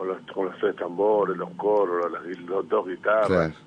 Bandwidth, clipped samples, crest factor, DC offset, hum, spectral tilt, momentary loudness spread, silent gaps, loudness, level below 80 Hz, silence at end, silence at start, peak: 9.6 kHz; under 0.1%; 16 dB; under 0.1%; none; -7.5 dB/octave; 8 LU; none; -25 LUFS; -60 dBFS; 0.1 s; 0 s; -8 dBFS